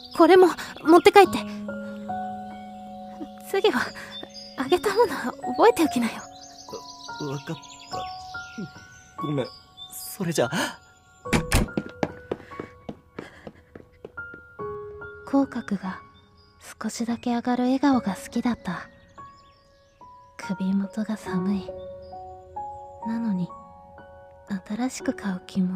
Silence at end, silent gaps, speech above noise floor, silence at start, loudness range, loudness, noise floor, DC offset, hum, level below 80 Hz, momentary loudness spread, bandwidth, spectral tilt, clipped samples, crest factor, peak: 0 s; none; 34 dB; 0 s; 10 LU; -24 LUFS; -57 dBFS; under 0.1%; none; -46 dBFS; 22 LU; 16 kHz; -5.5 dB/octave; under 0.1%; 26 dB; 0 dBFS